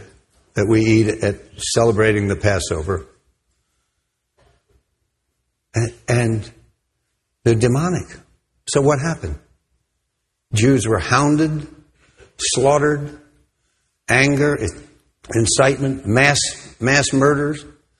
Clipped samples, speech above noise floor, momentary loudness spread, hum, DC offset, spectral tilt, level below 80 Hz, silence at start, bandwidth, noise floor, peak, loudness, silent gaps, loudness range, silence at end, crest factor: under 0.1%; 57 dB; 13 LU; none; under 0.1%; -5 dB/octave; -40 dBFS; 0 s; 12.5 kHz; -74 dBFS; 0 dBFS; -18 LUFS; none; 9 LU; 0.3 s; 20 dB